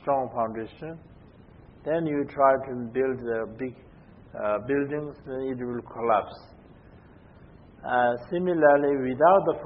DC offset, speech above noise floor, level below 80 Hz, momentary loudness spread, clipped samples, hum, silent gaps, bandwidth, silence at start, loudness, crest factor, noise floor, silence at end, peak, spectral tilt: under 0.1%; 26 dB; -58 dBFS; 18 LU; under 0.1%; none; none; 5.6 kHz; 0.05 s; -26 LUFS; 20 dB; -51 dBFS; 0 s; -6 dBFS; -11 dB/octave